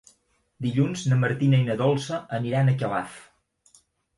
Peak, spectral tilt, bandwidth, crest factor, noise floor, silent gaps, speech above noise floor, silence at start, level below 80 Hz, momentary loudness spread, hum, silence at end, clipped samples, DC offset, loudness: -10 dBFS; -7 dB/octave; 11.5 kHz; 16 dB; -66 dBFS; none; 43 dB; 0.6 s; -62 dBFS; 9 LU; none; 0.95 s; under 0.1%; under 0.1%; -24 LUFS